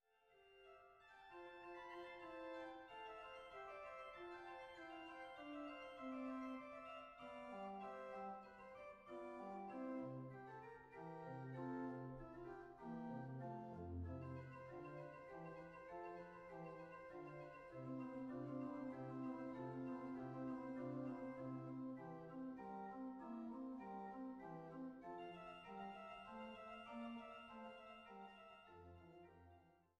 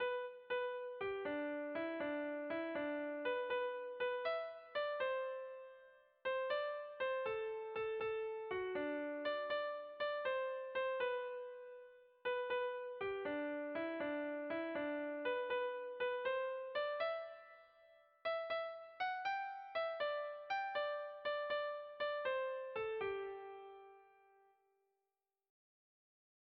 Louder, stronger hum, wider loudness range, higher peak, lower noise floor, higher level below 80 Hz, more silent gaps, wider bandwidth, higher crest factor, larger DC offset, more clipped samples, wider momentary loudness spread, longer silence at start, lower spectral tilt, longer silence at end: second, -54 LUFS vs -42 LUFS; neither; first, 5 LU vs 2 LU; second, -38 dBFS vs -30 dBFS; second, -74 dBFS vs under -90 dBFS; first, -76 dBFS vs -82 dBFS; neither; first, 8.8 kHz vs 5.8 kHz; about the same, 14 dB vs 14 dB; neither; neither; about the same, 9 LU vs 7 LU; first, 0.2 s vs 0 s; first, -8 dB/octave vs -0.5 dB/octave; second, 0.2 s vs 2.4 s